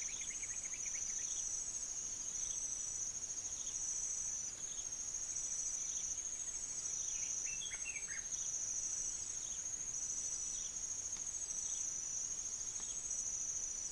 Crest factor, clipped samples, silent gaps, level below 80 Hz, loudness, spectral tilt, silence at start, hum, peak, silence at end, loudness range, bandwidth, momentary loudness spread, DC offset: 14 dB; under 0.1%; none; -64 dBFS; -39 LUFS; 1 dB/octave; 0 s; none; -28 dBFS; 0 s; 0 LU; 10.5 kHz; 3 LU; under 0.1%